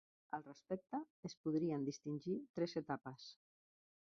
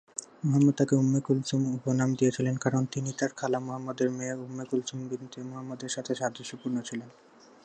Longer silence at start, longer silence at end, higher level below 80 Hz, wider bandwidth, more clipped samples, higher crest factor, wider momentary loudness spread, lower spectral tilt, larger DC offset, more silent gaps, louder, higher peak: about the same, 0.3 s vs 0.2 s; first, 0.7 s vs 0.55 s; second, -84 dBFS vs -70 dBFS; second, 7.4 kHz vs 9.6 kHz; neither; about the same, 18 dB vs 18 dB; about the same, 12 LU vs 14 LU; about the same, -6 dB/octave vs -6 dB/octave; neither; first, 1.10-1.23 s, 1.37-1.44 s, 2.49-2.54 s vs none; second, -45 LUFS vs -29 LUFS; second, -28 dBFS vs -12 dBFS